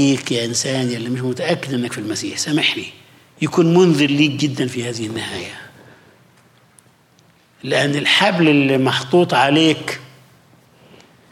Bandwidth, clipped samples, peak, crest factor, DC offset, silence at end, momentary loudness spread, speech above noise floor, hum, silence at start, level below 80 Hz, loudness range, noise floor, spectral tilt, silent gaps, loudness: 15.5 kHz; under 0.1%; -2 dBFS; 16 dB; under 0.1%; 1.25 s; 13 LU; 36 dB; none; 0 s; -66 dBFS; 8 LU; -53 dBFS; -4.5 dB/octave; none; -17 LUFS